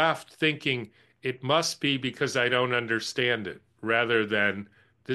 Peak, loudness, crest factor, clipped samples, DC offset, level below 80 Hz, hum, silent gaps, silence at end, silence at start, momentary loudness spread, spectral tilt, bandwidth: -8 dBFS; -26 LUFS; 20 dB; under 0.1%; under 0.1%; -70 dBFS; none; none; 0 s; 0 s; 11 LU; -4 dB/octave; 12.5 kHz